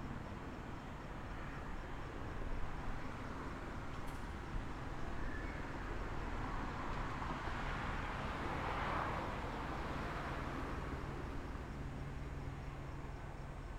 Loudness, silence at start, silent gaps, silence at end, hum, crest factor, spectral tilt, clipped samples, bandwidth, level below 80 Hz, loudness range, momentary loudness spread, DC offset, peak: -45 LUFS; 0 s; none; 0 s; none; 16 dB; -6 dB/octave; under 0.1%; 14.5 kHz; -48 dBFS; 5 LU; 7 LU; under 0.1%; -26 dBFS